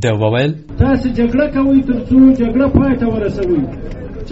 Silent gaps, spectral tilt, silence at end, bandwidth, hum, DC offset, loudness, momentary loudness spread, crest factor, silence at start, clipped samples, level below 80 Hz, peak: none; -7 dB/octave; 0 s; 8 kHz; none; under 0.1%; -14 LUFS; 10 LU; 12 dB; 0 s; under 0.1%; -28 dBFS; 0 dBFS